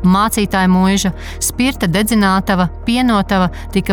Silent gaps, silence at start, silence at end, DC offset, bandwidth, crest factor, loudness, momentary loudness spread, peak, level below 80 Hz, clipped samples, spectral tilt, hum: none; 0 s; 0 s; under 0.1%; 19 kHz; 10 dB; -14 LUFS; 6 LU; -4 dBFS; -30 dBFS; under 0.1%; -5 dB/octave; none